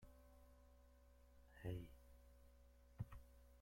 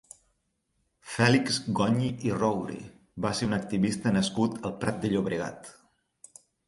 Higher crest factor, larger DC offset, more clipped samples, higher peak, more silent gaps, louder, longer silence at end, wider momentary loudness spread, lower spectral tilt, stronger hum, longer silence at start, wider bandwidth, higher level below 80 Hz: about the same, 22 dB vs 20 dB; neither; neither; second, -36 dBFS vs -8 dBFS; neither; second, -56 LUFS vs -28 LUFS; second, 0 s vs 0.95 s; first, 17 LU vs 14 LU; first, -7.5 dB/octave vs -5.5 dB/octave; neither; second, 0 s vs 1.05 s; first, 16.5 kHz vs 11.5 kHz; second, -66 dBFS vs -58 dBFS